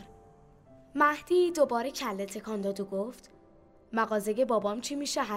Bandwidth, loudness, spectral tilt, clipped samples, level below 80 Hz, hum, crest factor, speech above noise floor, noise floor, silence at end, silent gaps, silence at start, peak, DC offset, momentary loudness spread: 16 kHz; -30 LUFS; -4 dB/octave; under 0.1%; -64 dBFS; none; 18 dB; 29 dB; -58 dBFS; 0 s; none; 0 s; -12 dBFS; under 0.1%; 10 LU